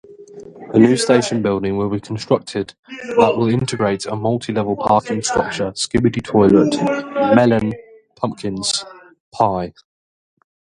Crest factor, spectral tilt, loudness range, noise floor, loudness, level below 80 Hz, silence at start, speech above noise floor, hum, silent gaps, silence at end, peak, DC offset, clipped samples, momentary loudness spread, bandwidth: 18 dB; -5.5 dB/octave; 3 LU; -38 dBFS; -17 LUFS; -46 dBFS; 0.1 s; 21 dB; none; 2.79-2.83 s, 9.20-9.32 s; 1.1 s; 0 dBFS; under 0.1%; under 0.1%; 12 LU; 11.5 kHz